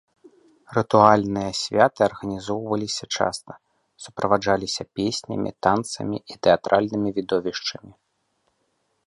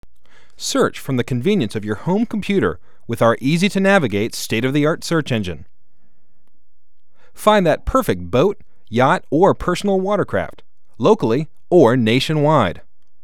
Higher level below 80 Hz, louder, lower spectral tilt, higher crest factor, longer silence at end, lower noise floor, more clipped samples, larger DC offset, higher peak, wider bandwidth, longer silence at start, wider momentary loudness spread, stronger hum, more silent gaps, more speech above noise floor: second, -56 dBFS vs -42 dBFS; second, -22 LUFS vs -17 LUFS; second, -4.5 dB/octave vs -6 dB/octave; about the same, 22 dB vs 18 dB; first, 1.15 s vs 0.45 s; first, -71 dBFS vs -60 dBFS; neither; second, under 0.1% vs 2%; about the same, 0 dBFS vs 0 dBFS; second, 11.5 kHz vs 17 kHz; about the same, 0.7 s vs 0.6 s; first, 12 LU vs 9 LU; neither; neither; first, 49 dB vs 43 dB